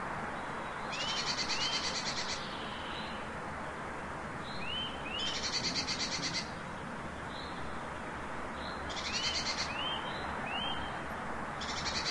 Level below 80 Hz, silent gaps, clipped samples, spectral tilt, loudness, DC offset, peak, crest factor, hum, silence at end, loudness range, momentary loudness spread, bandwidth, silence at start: -54 dBFS; none; under 0.1%; -2.5 dB/octave; -36 LUFS; 0.1%; -20 dBFS; 18 dB; none; 0 s; 3 LU; 9 LU; 12 kHz; 0 s